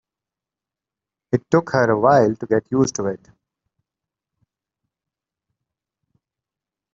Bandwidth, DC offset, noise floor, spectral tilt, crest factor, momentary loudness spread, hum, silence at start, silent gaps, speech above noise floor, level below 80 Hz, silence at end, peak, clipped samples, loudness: 8 kHz; under 0.1%; -88 dBFS; -6 dB/octave; 22 dB; 11 LU; none; 1.3 s; none; 70 dB; -58 dBFS; 3.75 s; -2 dBFS; under 0.1%; -19 LUFS